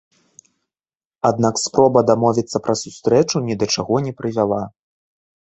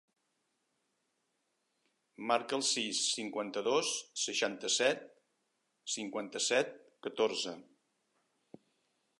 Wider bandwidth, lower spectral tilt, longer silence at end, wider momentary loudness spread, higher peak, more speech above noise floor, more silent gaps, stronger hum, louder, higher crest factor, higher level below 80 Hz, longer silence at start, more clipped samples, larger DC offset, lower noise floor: second, 8.2 kHz vs 11.5 kHz; first, -5 dB/octave vs -1 dB/octave; second, 0.7 s vs 1.6 s; about the same, 8 LU vs 10 LU; first, -2 dBFS vs -16 dBFS; first, over 73 dB vs 47 dB; neither; neither; first, -18 LUFS vs -34 LUFS; about the same, 18 dB vs 22 dB; first, -54 dBFS vs under -90 dBFS; second, 1.25 s vs 2.2 s; neither; neither; first, under -90 dBFS vs -81 dBFS